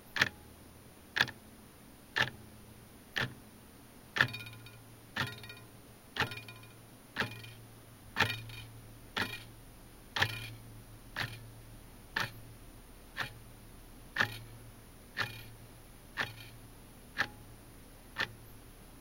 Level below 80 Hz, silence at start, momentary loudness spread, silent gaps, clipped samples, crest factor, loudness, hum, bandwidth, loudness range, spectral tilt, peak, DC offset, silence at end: -60 dBFS; 0 s; 22 LU; none; under 0.1%; 34 dB; -37 LUFS; none; 17 kHz; 5 LU; -3 dB/octave; -6 dBFS; under 0.1%; 0 s